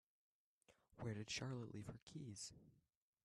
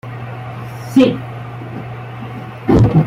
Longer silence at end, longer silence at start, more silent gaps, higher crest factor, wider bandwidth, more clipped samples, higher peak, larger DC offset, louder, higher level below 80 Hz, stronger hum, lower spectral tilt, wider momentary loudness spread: first, 0.45 s vs 0 s; first, 0.7 s vs 0.05 s; first, 2.02-2.07 s vs none; about the same, 18 dB vs 14 dB; second, 12.5 kHz vs 14 kHz; neither; second, -36 dBFS vs -2 dBFS; neither; second, -51 LUFS vs -17 LUFS; second, -78 dBFS vs -34 dBFS; neither; second, -4.5 dB/octave vs -8.5 dB/octave; second, 9 LU vs 16 LU